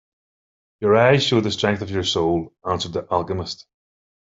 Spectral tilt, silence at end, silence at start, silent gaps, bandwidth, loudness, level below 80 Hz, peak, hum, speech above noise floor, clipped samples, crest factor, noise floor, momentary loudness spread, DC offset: -5 dB/octave; 0.65 s; 0.8 s; none; 8 kHz; -20 LUFS; -54 dBFS; -2 dBFS; none; over 70 dB; under 0.1%; 20 dB; under -90 dBFS; 12 LU; under 0.1%